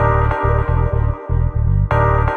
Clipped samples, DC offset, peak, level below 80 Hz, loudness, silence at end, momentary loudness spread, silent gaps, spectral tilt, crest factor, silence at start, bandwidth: under 0.1%; under 0.1%; -2 dBFS; -20 dBFS; -17 LUFS; 0 s; 5 LU; none; -9.5 dB/octave; 12 dB; 0 s; 4.2 kHz